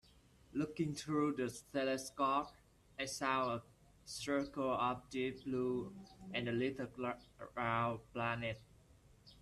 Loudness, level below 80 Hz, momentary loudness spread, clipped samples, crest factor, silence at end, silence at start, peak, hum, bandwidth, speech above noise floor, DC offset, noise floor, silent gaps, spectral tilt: -40 LUFS; -68 dBFS; 12 LU; under 0.1%; 20 dB; 0 s; 0.5 s; -20 dBFS; none; 13.5 kHz; 27 dB; under 0.1%; -66 dBFS; none; -5 dB/octave